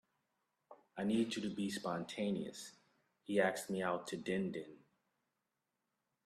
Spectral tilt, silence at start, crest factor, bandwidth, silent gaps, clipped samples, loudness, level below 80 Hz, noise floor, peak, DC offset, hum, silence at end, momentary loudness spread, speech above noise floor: -5 dB/octave; 0.7 s; 22 dB; 14 kHz; none; under 0.1%; -39 LUFS; -80 dBFS; -88 dBFS; -20 dBFS; under 0.1%; none; 1.5 s; 17 LU; 49 dB